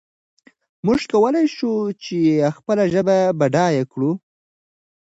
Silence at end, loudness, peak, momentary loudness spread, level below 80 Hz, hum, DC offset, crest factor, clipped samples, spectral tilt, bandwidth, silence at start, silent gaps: 0.85 s; -19 LUFS; -4 dBFS; 7 LU; -58 dBFS; none; under 0.1%; 16 dB; under 0.1%; -7 dB/octave; 8 kHz; 0.85 s; none